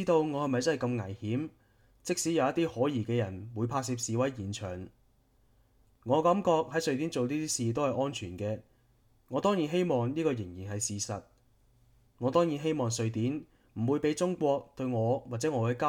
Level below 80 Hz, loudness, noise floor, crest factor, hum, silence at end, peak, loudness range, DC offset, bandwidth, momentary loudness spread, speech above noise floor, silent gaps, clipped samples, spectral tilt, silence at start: -66 dBFS; -31 LUFS; -67 dBFS; 18 dB; none; 0 s; -12 dBFS; 2 LU; under 0.1%; 16.5 kHz; 9 LU; 36 dB; none; under 0.1%; -5.5 dB/octave; 0 s